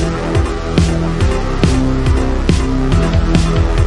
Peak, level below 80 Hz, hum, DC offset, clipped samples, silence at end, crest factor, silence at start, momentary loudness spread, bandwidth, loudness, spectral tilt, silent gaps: 0 dBFS; -16 dBFS; none; under 0.1%; under 0.1%; 0 s; 12 dB; 0 s; 3 LU; 11.5 kHz; -15 LUFS; -6.5 dB/octave; none